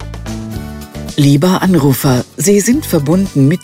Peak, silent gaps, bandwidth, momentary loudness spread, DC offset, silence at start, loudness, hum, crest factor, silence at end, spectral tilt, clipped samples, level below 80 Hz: 0 dBFS; none; 16.5 kHz; 15 LU; under 0.1%; 0 s; -12 LUFS; none; 12 dB; 0.05 s; -6 dB/octave; under 0.1%; -34 dBFS